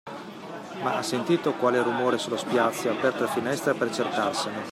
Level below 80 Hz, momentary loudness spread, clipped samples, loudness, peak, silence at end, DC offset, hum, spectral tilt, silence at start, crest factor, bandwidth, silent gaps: -72 dBFS; 12 LU; under 0.1%; -26 LUFS; -10 dBFS; 0 s; under 0.1%; none; -4.5 dB/octave; 0.05 s; 18 dB; 15.5 kHz; none